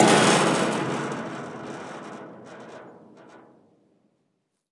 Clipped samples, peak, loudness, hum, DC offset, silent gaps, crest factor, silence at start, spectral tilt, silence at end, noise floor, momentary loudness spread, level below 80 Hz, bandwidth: under 0.1%; -4 dBFS; -23 LUFS; none; under 0.1%; none; 22 dB; 0 s; -4 dB/octave; 1.35 s; -75 dBFS; 25 LU; -72 dBFS; 11.5 kHz